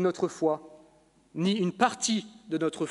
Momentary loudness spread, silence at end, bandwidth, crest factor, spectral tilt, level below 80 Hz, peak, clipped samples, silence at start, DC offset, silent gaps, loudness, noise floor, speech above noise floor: 9 LU; 0 s; 11.5 kHz; 22 dB; -4.5 dB/octave; -72 dBFS; -8 dBFS; under 0.1%; 0 s; under 0.1%; none; -29 LUFS; -61 dBFS; 33 dB